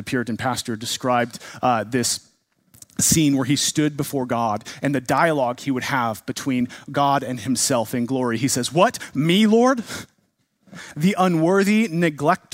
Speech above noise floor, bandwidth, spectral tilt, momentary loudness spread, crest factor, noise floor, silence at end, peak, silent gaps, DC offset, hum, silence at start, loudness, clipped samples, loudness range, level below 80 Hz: 47 dB; 16 kHz; -4 dB/octave; 8 LU; 18 dB; -67 dBFS; 0.15 s; -4 dBFS; none; under 0.1%; none; 0 s; -21 LUFS; under 0.1%; 3 LU; -58 dBFS